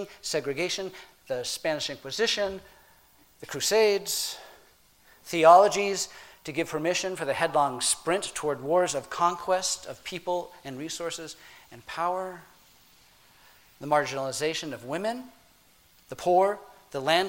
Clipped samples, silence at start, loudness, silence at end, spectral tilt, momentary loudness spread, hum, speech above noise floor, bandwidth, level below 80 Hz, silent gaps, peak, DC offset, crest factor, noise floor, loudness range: under 0.1%; 0 s; -27 LUFS; 0 s; -2.5 dB/octave; 16 LU; none; 33 dB; 16.5 kHz; -64 dBFS; none; -4 dBFS; under 0.1%; 24 dB; -60 dBFS; 9 LU